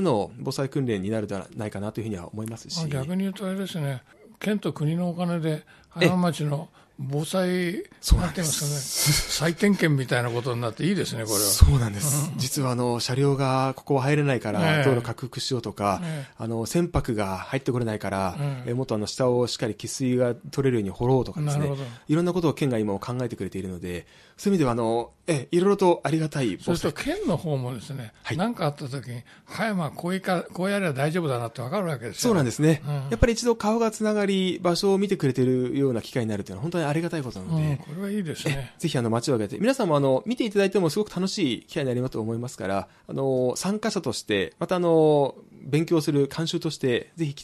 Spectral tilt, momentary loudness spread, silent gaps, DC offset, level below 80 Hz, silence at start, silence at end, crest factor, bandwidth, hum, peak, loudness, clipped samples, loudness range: -5.5 dB/octave; 10 LU; none; under 0.1%; -38 dBFS; 0 s; 0 s; 24 dB; 14 kHz; none; 0 dBFS; -25 LUFS; under 0.1%; 5 LU